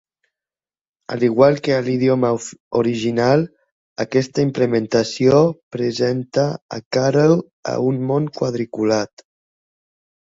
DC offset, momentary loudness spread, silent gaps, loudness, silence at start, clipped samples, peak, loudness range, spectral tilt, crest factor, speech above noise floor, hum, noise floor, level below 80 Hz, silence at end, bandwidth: under 0.1%; 10 LU; 2.60-2.71 s, 3.72-3.96 s, 5.63-5.71 s, 6.62-6.69 s, 6.85-6.91 s, 7.53-7.63 s; -18 LUFS; 1.1 s; under 0.1%; -2 dBFS; 2 LU; -6.5 dB/octave; 18 dB; over 72 dB; none; under -90 dBFS; -58 dBFS; 1.2 s; 8 kHz